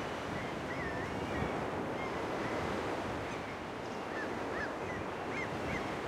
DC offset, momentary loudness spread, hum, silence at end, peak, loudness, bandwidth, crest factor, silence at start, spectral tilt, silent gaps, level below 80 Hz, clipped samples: under 0.1%; 4 LU; none; 0 s; -22 dBFS; -38 LUFS; 16 kHz; 16 dB; 0 s; -5.5 dB/octave; none; -56 dBFS; under 0.1%